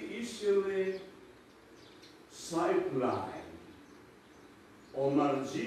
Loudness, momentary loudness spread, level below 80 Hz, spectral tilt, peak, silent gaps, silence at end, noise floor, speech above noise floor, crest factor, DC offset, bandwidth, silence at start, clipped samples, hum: -33 LUFS; 24 LU; -70 dBFS; -5.5 dB/octave; -18 dBFS; none; 0 s; -57 dBFS; 26 dB; 18 dB; under 0.1%; 13.5 kHz; 0 s; under 0.1%; none